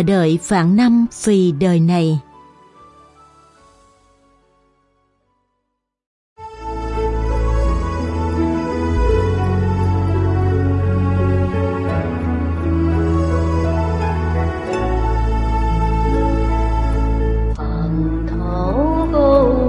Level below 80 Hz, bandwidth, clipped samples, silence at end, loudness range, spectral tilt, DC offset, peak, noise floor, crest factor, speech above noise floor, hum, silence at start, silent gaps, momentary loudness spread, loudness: -24 dBFS; 11.5 kHz; under 0.1%; 0 s; 7 LU; -7.5 dB/octave; under 0.1%; -2 dBFS; -74 dBFS; 16 dB; 60 dB; none; 0 s; 6.06-6.36 s; 7 LU; -18 LUFS